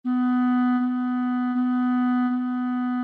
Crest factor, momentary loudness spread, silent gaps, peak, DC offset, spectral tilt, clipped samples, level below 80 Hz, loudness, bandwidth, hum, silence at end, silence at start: 8 dB; 4 LU; none; -14 dBFS; under 0.1%; -7.5 dB/octave; under 0.1%; -80 dBFS; -23 LUFS; 4.2 kHz; none; 0 s; 0.05 s